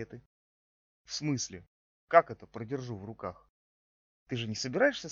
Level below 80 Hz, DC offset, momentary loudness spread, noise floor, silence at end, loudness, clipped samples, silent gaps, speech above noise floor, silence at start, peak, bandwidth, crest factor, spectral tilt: -70 dBFS; under 0.1%; 17 LU; under -90 dBFS; 0 s; -32 LUFS; under 0.1%; 0.26-1.05 s, 1.67-2.08 s, 3.49-4.26 s; over 58 dB; 0 s; -8 dBFS; 7.6 kHz; 26 dB; -3.5 dB/octave